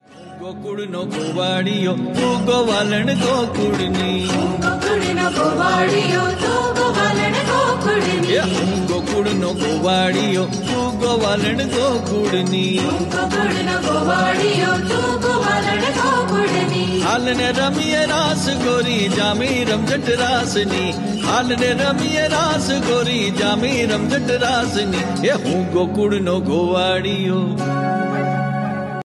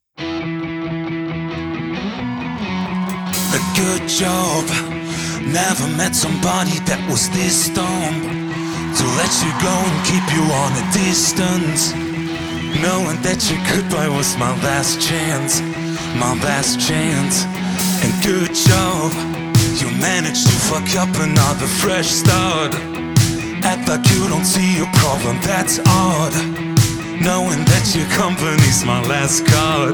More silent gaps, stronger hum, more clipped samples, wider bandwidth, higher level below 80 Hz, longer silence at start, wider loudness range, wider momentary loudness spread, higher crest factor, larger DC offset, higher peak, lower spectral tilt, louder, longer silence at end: neither; neither; neither; second, 12.5 kHz vs over 20 kHz; about the same, -44 dBFS vs -40 dBFS; about the same, 0.1 s vs 0.2 s; about the same, 1 LU vs 3 LU; second, 4 LU vs 9 LU; about the same, 14 dB vs 16 dB; neither; second, -4 dBFS vs 0 dBFS; about the same, -4.5 dB/octave vs -4 dB/octave; about the same, -18 LUFS vs -16 LUFS; about the same, 0.05 s vs 0 s